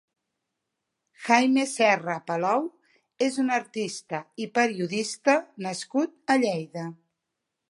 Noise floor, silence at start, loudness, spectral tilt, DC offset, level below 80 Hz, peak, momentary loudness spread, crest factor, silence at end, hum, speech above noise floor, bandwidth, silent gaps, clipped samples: -83 dBFS; 1.2 s; -25 LUFS; -4 dB/octave; under 0.1%; -78 dBFS; -4 dBFS; 13 LU; 24 dB; 0.75 s; none; 58 dB; 11.5 kHz; none; under 0.1%